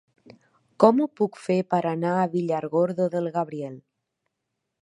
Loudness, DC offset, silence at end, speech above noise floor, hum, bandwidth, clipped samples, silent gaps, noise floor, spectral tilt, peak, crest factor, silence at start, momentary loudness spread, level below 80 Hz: -24 LUFS; under 0.1%; 1 s; 58 dB; none; 11.5 kHz; under 0.1%; none; -81 dBFS; -8 dB/octave; -2 dBFS; 24 dB; 0.8 s; 10 LU; -74 dBFS